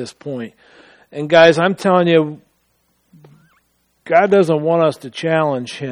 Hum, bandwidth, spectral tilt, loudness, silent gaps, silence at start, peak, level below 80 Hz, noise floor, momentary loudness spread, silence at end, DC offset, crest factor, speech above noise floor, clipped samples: none; 11.5 kHz; -6 dB/octave; -14 LUFS; none; 0 s; 0 dBFS; -62 dBFS; -63 dBFS; 17 LU; 0 s; under 0.1%; 16 dB; 48 dB; under 0.1%